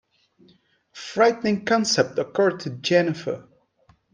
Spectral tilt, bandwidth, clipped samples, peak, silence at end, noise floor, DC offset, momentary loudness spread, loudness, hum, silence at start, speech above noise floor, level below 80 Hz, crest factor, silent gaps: -4 dB/octave; 10 kHz; under 0.1%; -4 dBFS; 0.7 s; -61 dBFS; under 0.1%; 12 LU; -22 LUFS; none; 0.95 s; 39 dB; -66 dBFS; 20 dB; none